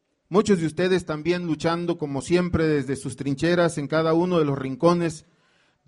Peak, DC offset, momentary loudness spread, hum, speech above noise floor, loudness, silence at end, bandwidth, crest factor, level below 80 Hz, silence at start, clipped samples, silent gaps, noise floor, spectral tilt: -4 dBFS; under 0.1%; 7 LU; none; 41 dB; -23 LUFS; 0.7 s; 11.5 kHz; 18 dB; -50 dBFS; 0.3 s; under 0.1%; none; -64 dBFS; -6.5 dB/octave